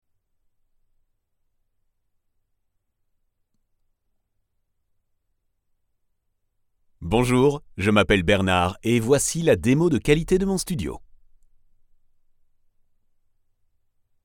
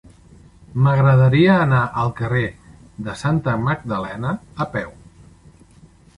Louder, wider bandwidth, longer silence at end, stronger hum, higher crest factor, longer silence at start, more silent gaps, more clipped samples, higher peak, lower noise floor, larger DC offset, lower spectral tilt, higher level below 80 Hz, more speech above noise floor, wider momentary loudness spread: about the same, -21 LUFS vs -19 LUFS; first, 16.5 kHz vs 10.5 kHz; first, 3.2 s vs 1.25 s; neither; first, 22 dB vs 16 dB; first, 7 s vs 0.7 s; neither; neither; about the same, -4 dBFS vs -4 dBFS; first, -73 dBFS vs -48 dBFS; neither; second, -5 dB/octave vs -8 dB/octave; about the same, -44 dBFS vs -46 dBFS; first, 52 dB vs 31 dB; second, 7 LU vs 15 LU